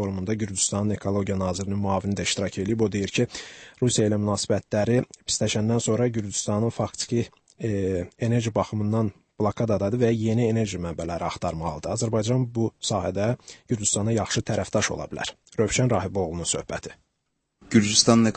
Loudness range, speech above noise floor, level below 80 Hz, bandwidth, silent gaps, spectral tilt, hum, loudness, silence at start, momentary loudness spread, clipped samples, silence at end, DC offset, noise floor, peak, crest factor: 2 LU; 52 dB; -52 dBFS; 8.8 kHz; none; -4.5 dB/octave; none; -25 LUFS; 0 s; 7 LU; under 0.1%; 0 s; under 0.1%; -77 dBFS; -4 dBFS; 22 dB